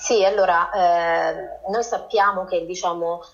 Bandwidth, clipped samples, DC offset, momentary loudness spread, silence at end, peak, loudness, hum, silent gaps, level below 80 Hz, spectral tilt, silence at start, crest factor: 7.6 kHz; under 0.1%; under 0.1%; 8 LU; 0.05 s; -6 dBFS; -21 LUFS; none; none; -54 dBFS; -2.5 dB/octave; 0 s; 14 dB